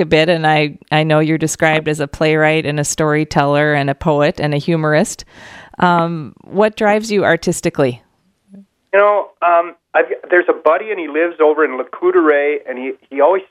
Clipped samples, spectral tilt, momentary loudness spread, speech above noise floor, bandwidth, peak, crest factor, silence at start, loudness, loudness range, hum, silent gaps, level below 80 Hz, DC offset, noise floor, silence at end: under 0.1%; -5 dB/octave; 8 LU; 37 dB; 14 kHz; 0 dBFS; 14 dB; 0 s; -15 LUFS; 2 LU; none; none; -48 dBFS; under 0.1%; -52 dBFS; 0.05 s